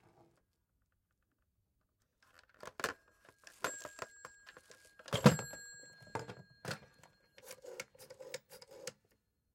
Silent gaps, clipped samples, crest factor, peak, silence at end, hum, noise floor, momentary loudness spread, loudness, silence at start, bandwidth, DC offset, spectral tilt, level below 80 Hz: none; under 0.1%; 30 dB; -12 dBFS; 0.65 s; none; -82 dBFS; 27 LU; -39 LUFS; 2.65 s; 16.5 kHz; under 0.1%; -5 dB/octave; -72 dBFS